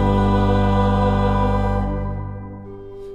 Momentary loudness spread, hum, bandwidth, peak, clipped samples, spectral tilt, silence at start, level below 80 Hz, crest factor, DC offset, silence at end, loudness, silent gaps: 18 LU; 50 Hz at -25 dBFS; 7.8 kHz; -6 dBFS; under 0.1%; -8.5 dB/octave; 0 s; -26 dBFS; 14 dB; under 0.1%; 0 s; -19 LUFS; none